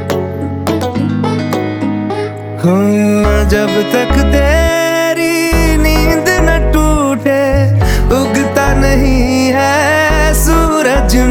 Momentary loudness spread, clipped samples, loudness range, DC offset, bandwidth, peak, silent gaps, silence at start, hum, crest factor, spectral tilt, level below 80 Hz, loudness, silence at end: 6 LU; under 0.1%; 2 LU; under 0.1%; 18 kHz; 0 dBFS; none; 0 s; none; 10 dB; -5.5 dB/octave; -16 dBFS; -11 LUFS; 0 s